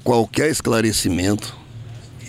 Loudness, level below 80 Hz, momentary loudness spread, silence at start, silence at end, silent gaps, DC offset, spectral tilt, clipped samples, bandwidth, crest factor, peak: -19 LUFS; -44 dBFS; 20 LU; 0 s; 0 s; none; under 0.1%; -4.5 dB/octave; under 0.1%; 16 kHz; 16 dB; -4 dBFS